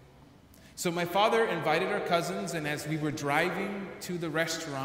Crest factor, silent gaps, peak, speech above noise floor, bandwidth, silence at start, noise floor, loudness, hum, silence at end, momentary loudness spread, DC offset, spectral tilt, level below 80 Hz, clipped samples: 20 dB; none; -12 dBFS; 26 dB; 16 kHz; 0 s; -55 dBFS; -30 LUFS; none; 0 s; 10 LU; under 0.1%; -4.5 dB/octave; -64 dBFS; under 0.1%